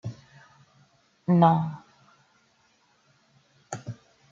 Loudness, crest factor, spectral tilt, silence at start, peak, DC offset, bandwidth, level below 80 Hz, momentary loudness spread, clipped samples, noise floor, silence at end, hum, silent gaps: -24 LUFS; 22 dB; -8 dB/octave; 0.05 s; -6 dBFS; under 0.1%; 7.6 kHz; -70 dBFS; 24 LU; under 0.1%; -65 dBFS; 0.4 s; none; none